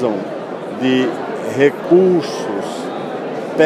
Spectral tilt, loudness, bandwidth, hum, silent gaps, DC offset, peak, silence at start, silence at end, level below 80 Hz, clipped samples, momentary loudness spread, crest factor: -6 dB/octave; -18 LUFS; 12.5 kHz; none; none; under 0.1%; 0 dBFS; 0 s; 0 s; -66 dBFS; under 0.1%; 12 LU; 16 dB